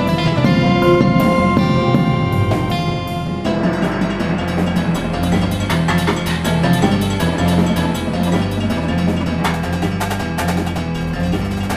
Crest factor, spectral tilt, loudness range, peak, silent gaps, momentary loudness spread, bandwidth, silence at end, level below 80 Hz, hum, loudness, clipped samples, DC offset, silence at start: 16 dB; -6.5 dB/octave; 4 LU; 0 dBFS; none; 6 LU; 15.5 kHz; 0 s; -32 dBFS; none; -17 LUFS; under 0.1%; under 0.1%; 0 s